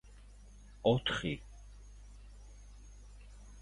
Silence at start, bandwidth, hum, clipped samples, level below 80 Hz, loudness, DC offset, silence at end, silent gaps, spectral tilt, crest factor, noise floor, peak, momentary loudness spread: 0.05 s; 11.5 kHz; 50 Hz at -55 dBFS; under 0.1%; -54 dBFS; -34 LUFS; under 0.1%; 0 s; none; -5.5 dB/octave; 24 dB; -55 dBFS; -16 dBFS; 27 LU